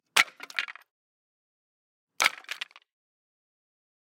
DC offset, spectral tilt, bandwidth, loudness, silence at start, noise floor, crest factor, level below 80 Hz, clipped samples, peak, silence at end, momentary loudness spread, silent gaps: under 0.1%; 2 dB/octave; 16.5 kHz; -28 LUFS; 0.15 s; under -90 dBFS; 32 dB; -88 dBFS; under 0.1%; -2 dBFS; 1.5 s; 14 LU; 0.91-2.07 s